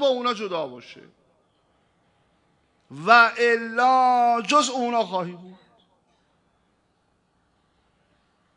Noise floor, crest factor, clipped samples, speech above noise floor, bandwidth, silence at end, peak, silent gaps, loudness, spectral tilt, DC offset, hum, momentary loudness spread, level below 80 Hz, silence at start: -68 dBFS; 22 dB; under 0.1%; 47 dB; 11 kHz; 3.05 s; -2 dBFS; none; -20 LUFS; -3 dB/octave; under 0.1%; none; 18 LU; -78 dBFS; 0 s